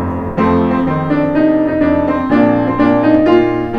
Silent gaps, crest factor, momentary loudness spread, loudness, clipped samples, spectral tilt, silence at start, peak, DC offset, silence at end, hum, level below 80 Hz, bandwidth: none; 12 dB; 4 LU; -13 LUFS; under 0.1%; -9 dB/octave; 0 s; 0 dBFS; under 0.1%; 0 s; none; -36 dBFS; 5.4 kHz